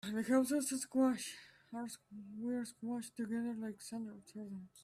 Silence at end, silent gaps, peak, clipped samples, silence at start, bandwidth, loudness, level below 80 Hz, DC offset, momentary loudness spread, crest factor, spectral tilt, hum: 0 s; none; -22 dBFS; under 0.1%; 0.05 s; 15 kHz; -39 LUFS; -80 dBFS; under 0.1%; 16 LU; 16 dB; -4 dB/octave; none